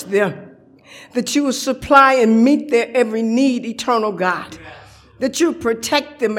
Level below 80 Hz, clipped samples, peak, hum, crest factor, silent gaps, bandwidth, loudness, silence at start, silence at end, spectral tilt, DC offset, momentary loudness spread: -52 dBFS; under 0.1%; 0 dBFS; none; 18 dB; none; 16.5 kHz; -16 LUFS; 0 s; 0 s; -4 dB/octave; under 0.1%; 13 LU